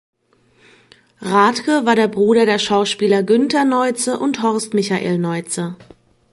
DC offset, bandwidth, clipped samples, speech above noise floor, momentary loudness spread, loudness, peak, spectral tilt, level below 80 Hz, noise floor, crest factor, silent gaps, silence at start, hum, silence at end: under 0.1%; 11.5 kHz; under 0.1%; 41 dB; 7 LU; -16 LUFS; -2 dBFS; -4.5 dB/octave; -62 dBFS; -57 dBFS; 16 dB; none; 1.2 s; none; 0.5 s